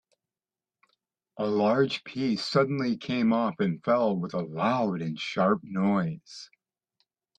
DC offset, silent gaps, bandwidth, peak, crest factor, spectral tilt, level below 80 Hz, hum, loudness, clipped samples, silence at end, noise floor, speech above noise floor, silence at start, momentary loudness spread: under 0.1%; none; 9.2 kHz; -10 dBFS; 18 dB; -7 dB/octave; -70 dBFS; none; -27 LUFS; under 0.1%; 0.95 s; under -90 dBFS; over 63 dB; 1.35 s; 8 LU